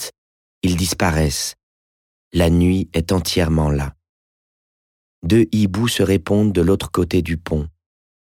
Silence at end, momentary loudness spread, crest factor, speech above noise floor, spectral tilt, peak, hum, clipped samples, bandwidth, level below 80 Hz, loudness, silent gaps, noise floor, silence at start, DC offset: 0.65 s; 9 LU; 14 dB; over 73 dB; -5.5 dB/octave; -6 dBFS; none; under 0.1%; 17 kHz; -34 dBFS; -18 LUFS; 0.18-0.61 s, 1.63-2.31 s, 4.09-5.22 s; under -90 dBFS; 0 s; under 0.1%